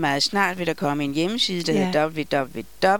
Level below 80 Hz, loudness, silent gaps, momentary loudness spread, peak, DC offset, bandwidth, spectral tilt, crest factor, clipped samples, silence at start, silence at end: -54 dBFS; -23 LUFS; none; 5 LU; -6 dBFS; 0.7%; 18 kHz; -4.5 dB/octave; 18 dB; under 0.1%; 0 s; 0 s